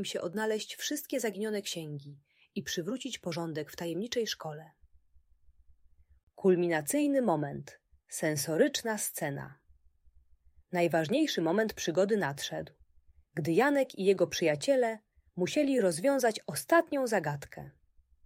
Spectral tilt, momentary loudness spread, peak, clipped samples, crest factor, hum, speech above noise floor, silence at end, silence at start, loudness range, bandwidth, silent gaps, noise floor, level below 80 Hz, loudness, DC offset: -4.5 dB/octave; 14 LU; -12 dBFS; under 0.1%; 20 dB; none; 33 dB; 0.55 s; 0 s; 8 LU; 16 kHz; 6.23-6.27 s; -64 dBFS; -68 dBFS; -31 LUFS; under 0.1%